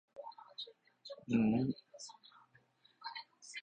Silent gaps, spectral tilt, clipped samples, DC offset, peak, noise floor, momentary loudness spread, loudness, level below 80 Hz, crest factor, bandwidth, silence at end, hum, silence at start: none; -6 dB/octave; under 0.1%; under 0.1%; -20 dBFS; -70 dBFS; 20 LU; -39 LUFS; -72 dBFS; 20 dB; 8.8 kHz; 0 s; none; 0.15 s